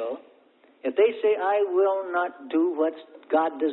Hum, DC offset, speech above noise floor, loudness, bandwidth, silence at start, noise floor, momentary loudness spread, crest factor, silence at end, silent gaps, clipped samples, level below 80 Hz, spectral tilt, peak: none; under 0.1%; 35 dB; -25 LUFS; 4.1 kHz; 0 s; -58 dBFS; 12 LU; 16 dB; 0 s; none; under 0.1%; -78 dBFS; -8 dB/octave; -10 dBFS